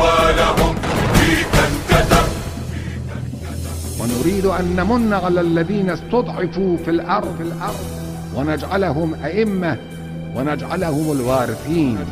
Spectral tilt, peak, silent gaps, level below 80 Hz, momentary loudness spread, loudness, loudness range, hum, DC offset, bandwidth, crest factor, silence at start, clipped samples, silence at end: -5.5 dB/octave; 0 dBFS; none; -30 dBFS; 12 LU; -19 LUFS; 4 LU; none; under 0.1%; 16 kHz; 18 dB; 0 s; under 0.1%; 0 s